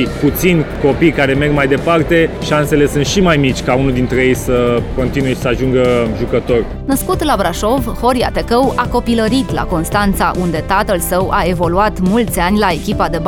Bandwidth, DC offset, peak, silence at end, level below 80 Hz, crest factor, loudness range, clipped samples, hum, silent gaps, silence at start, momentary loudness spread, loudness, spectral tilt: 19 kHz; under 0.1%; 0 dBFS; 0 s; -26 dBFS; 14 dB; 2 LU; under 0.1%; none; none; 0 s; 4 LU; -14 LUFS; -5.5 dB/octave